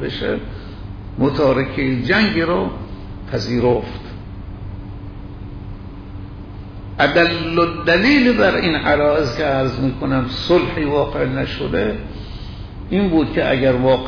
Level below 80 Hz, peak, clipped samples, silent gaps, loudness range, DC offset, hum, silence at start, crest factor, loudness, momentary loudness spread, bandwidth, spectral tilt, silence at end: -34 dBFS; -4 dBFS; under 0.1%; none; 9 LU; under 0.1%; none; 0 s; 14 dB; -17 LUFS; 19 LU; 5.4 kHz; -7 dB/octave; 0 s